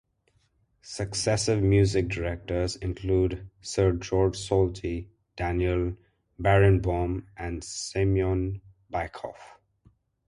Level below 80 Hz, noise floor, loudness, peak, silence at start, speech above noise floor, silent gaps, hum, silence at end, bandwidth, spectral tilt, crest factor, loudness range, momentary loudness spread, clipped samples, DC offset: -40 dBFS; -69 dBFS; -27 LUFS; -8 dBFS; 0.85 s; 43 dB; none; none; 0.8 s; 11.5 kHz; -6 dB/octave; 20 dB; 2 LU; 14 LU; under 0.1%; under 0.1%